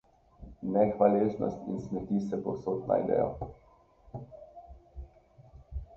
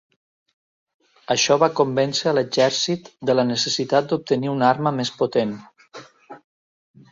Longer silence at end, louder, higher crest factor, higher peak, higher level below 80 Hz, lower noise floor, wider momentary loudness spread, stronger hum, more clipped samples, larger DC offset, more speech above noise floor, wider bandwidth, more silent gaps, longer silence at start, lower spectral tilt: second, 0 s vs 0.75 s; second, -30 LUFS vs -20 LUFS; about the same, 22 dB vs 20 dB; second, -10 dBFS vs -2 dBFS; first, -52 dBFS vs -66 dBFS; first, -60 dBFS vs -44 dBFS; first, 25 LU vs 6 LU; neither; neither; neither; first, 31 dB vs 24 dB; second, 7 kHz vs 7.8 kHz; neither; second, 0.4 s vs 1.3 s; first, -10 dB/octave vs -4 dB/octave